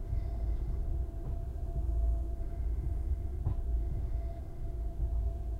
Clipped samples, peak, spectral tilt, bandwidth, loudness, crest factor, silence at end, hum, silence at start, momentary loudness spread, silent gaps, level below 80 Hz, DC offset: under 0.1%; -20 dBFS; -9.5 dB/octave; 2.2 kHz; -37 LUFS; 12 dB; 0 s; none; 0 s; 6 LU; none; -34 dBFS; under 0.1%